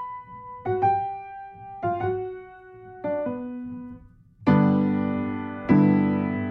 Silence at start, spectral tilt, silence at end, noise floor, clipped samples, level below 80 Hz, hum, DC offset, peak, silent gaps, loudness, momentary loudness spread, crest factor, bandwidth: 0 s; -10.5 dB/octave; 0 s; -49 dBFS; under 0.1%; -56 dBFS; none; under 0.1%; -6 dBFS; none; -24 LUFS; 21 LU; 18 dB; 5.2 kHz